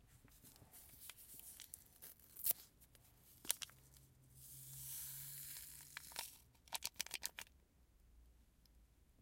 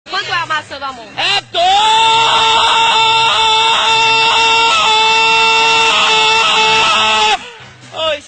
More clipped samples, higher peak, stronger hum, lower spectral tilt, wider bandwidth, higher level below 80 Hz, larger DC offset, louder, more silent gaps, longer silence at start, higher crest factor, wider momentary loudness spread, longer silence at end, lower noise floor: neither; second, -16 dBFS vs -2 dBFS; neither; about the same, 0 dB/octave vs 0 dB/octave; first, 17 kHz vs 9.2 kHz; second, -74 dBFS vs -46 dBFS; neither; second, -48 LUFS vs -9 LUFS; neither; about the same, 0 s vs 0.05 s; first, 38 dB vs 10 dB; first, 22 LU vs 9 LU; about the same, 0 s vs 0.05 s; first, -71 dBFS vs -34 dBFS